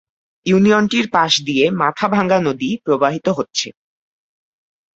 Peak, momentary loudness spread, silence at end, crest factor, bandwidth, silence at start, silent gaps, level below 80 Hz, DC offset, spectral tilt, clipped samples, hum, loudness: -2 dBFS; 9 LU; 1.25 s; 16 dB; 8 kHz; 0.45 s; none; -56 dBFS; under 0.1%; -4.5 dB/octave; under 0.1%; none; -16 LUFS